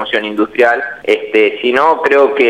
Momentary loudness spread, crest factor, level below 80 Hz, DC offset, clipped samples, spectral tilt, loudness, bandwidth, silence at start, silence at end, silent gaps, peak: 6 LU; 12 dB; -56 dBFS; 0.2%; under 0.1%; -4.5 dB/octave; -12 LUFS; 9.6 kHz; 0 s; 0 s; none; 0 dBFS